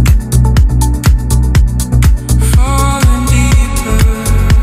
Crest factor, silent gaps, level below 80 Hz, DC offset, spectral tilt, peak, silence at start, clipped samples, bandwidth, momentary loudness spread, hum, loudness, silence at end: 8 dB; none; -10 dBFS; under 0.1%; -5.5 dB/octave; 0 dBFS; 0 s; under 0.1%; 15.5 kHz; 2 LU; none; -11 LUFS; 0 s